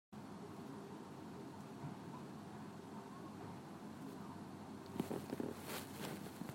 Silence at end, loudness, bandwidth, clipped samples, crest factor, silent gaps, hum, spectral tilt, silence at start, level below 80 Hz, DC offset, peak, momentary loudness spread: 0 s; -50 LUFS; 16 kHz; under 0.1%; 24 dB; none; none; -5.5 dB/octave; 0.1 s; -82 dBFS; under 0.1%; -26 dBFS; 7 LU